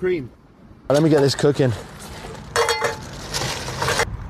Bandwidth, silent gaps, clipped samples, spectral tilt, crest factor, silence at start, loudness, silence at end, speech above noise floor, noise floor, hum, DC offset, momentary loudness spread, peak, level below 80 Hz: 14.5 kHz; none; under 0.1%; -4.5 dB/octave; 16 dB; 0 s; -21 LUFS; 0 s; 28 dB; -46 dBFS; none; under 0.1%; 18 LU; -6 dBFS; -42 dBFS